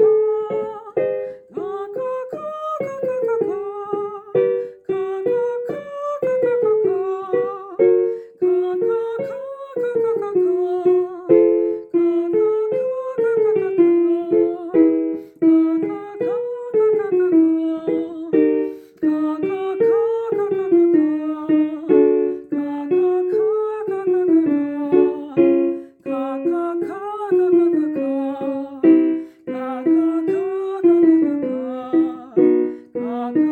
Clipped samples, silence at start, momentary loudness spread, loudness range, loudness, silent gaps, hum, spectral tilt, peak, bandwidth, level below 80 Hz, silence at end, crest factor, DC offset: under 0.1%; 0 s; 11 LU; 5 LU; -19 LUFS; none; none; -9 dB/octave; -2 dBFS; 4.1 kHz; -68 dBFS; 0 s; 16 dB; under 0.1%